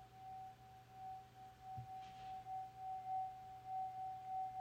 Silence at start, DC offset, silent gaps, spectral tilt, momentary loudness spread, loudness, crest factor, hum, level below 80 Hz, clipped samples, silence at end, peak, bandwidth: 0 s; under 0.1%; none; -5 dB/octave; 11 LU; -50 LUFS; 12 dB; none; -76 dBFS; under 0.1%; 0 s; -38 dBFS; 16.5 kHz